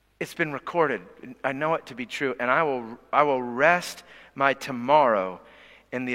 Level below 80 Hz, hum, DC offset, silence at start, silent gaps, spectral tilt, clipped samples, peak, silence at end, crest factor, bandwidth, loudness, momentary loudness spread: -66 dBFS; none; under 0.1%; 0.2 s; none; -5 dB/octave; under 0.1%; -4 dBFS; 0 s; 22 dB; 16 kHz; -25 LUFS; 15 LU